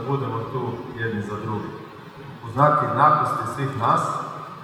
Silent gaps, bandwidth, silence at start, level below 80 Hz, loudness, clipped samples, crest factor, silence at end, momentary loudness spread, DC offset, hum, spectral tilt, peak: none; 15.5 kHz; 0 s; -60 dBFS; -22 LUFS; under 0.1%; 22 dB; 0 s; 20 LU; under 0.1%; none; -7 dB/octave; -2 dBFS